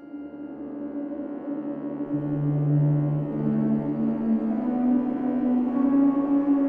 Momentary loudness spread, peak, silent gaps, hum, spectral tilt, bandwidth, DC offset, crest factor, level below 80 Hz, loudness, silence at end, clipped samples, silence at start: 12 LU; -12 dBFS; none; none; -12.5 dB/octave; 3.2 kHz; under 0.1%; 12 dB; -58 dBFS; -25 LUFS; 0 s; under 0.1%; 0 s